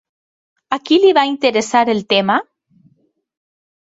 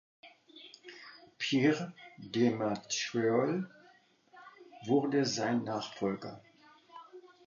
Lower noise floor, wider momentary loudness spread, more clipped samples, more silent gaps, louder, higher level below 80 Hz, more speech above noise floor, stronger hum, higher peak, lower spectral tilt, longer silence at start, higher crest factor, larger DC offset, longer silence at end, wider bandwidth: second, -60 dBFS vs -64 dBFS; second, 9 LU vs 24 LU; neither; neither; first, -15 LUFS vs -32 LUFS; first, -64 dBFS vs -78 dBFS; first, 46 dB vs 32 dB; neither; first, -2 dBFS vs -16 dBFS; about the same, -4 dB/octave vs -5 dB/octave; first, 0.7 s vs 0.25 s; about the same, 16 dB vs 20 dB; neither; first, 1.45 s vs 0.2 s; about the same, 8 kHz vs 7.4 kHz